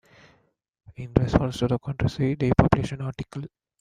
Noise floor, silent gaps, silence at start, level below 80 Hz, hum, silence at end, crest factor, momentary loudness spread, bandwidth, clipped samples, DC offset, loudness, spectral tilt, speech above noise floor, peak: -66 dBFS; none; 0.9 s; -40 dBFS; none; 0.35 s; 24 dB; 16 LU; 10.5 kHz; under 0.1%; under 0.1%; -24 LUFS; -8 dB/octave; 42 dB; -2 dBFS